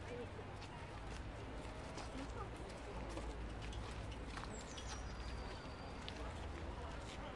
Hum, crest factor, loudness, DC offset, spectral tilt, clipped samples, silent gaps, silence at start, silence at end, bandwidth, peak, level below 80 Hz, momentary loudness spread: none; 20 dB; -49 LUFS; under 0.1%; -5 dB/octave; under 0.1%; none; 0 s; 0 s; 11.5 kHz; -28 dBFS; -52 dBFS; 2 LU